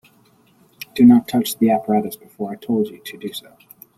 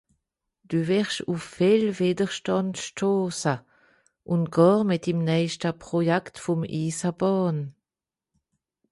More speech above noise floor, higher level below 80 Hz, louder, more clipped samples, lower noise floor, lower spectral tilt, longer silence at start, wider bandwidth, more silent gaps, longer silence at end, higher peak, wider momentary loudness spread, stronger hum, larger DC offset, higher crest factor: second, 38 dB vs over 66 dB; about the same, -60 dBFS vs -64 dBFS; first, -17 LUFS vs -25 LUFS; neither; second, -55 dBFS vs under -90 dBFS; about the same, -6 dB/octave vs -6 dB/octave; first, 0.95 s vs 0.7 s; first, 15 kHz vs 11.5 kHz; neither; second, 0.55 s vs 1.2 s; first, -2 dBFS vs -6 dBFS; first, 19 LU vs 9 LU; neither; neither; about the same, 18 dB vs 20 dB